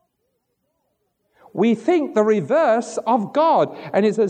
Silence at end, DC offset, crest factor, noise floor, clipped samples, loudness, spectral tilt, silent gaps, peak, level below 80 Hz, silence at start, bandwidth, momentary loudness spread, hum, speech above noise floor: 0 s; under 0.1%; 16 dB; -72 dBFS; under 0.1%; -19 LUFS; -6.5 dB/octave; none; -4 dBFS; -78 dBFS; 1.55 s; 9.8 kHz; 4 LU; none; 54 dB